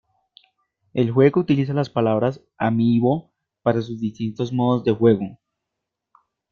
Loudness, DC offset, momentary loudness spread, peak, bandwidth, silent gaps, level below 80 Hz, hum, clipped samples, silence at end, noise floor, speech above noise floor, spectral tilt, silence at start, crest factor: -21 LUFS; under 0.1%; 10 LU; -2 dBFS; 6.8 kHz; none; -58 dBFS; none; under 0.1%; 1.2 s; -82 dBFS; 63 dB; -9 dB/octave; 0.95 s; 18 dB